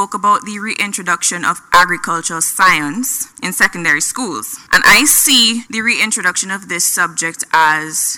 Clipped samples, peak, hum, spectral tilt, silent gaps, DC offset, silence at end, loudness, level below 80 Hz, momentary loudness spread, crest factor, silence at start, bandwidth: under 0.1%; 0 dBFS; none; -0.5 dB/octave; none; under 0.1%; 0 s; -12 LUFS; -48 dBFS; 11 LU; 14 dB; 0 s; 19.5 kHz